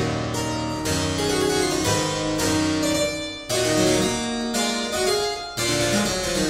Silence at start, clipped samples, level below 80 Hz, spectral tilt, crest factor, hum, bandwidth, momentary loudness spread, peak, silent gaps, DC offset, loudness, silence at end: 0 s; under 0.1%; -42 dBFS; -3.5 dB/octave; 16 dB; none; 16 kHz; 6 LU; -8 dBFS; none; under 0.1%; -22 LUFS; 0 s